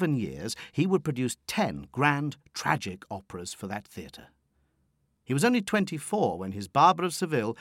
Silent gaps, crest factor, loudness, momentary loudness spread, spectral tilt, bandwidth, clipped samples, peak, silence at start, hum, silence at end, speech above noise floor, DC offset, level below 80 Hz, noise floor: none; 22 dB; -28 LUFS; 16 LU; -5 dB/octave; 16.5 kHz; under 0.1%; -8 dBFS; 0 s; none; 0.05 s; 44 dB; under 0.1%; -62 dBFS; -72 dBFS